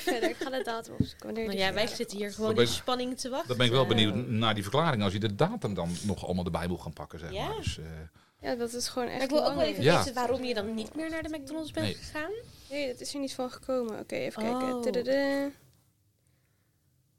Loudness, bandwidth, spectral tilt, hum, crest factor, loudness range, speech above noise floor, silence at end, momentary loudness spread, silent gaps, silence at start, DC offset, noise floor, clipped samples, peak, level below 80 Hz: -31 LUFS; 16.5 kHz; -5 dB/octave; none; 22 dB; 7 LU; 40 dB; 0 s; 11 LU; none; 0 s; 0.2%; -70 dBFS; under 0.1%; -8 dBFS; -56 dBFS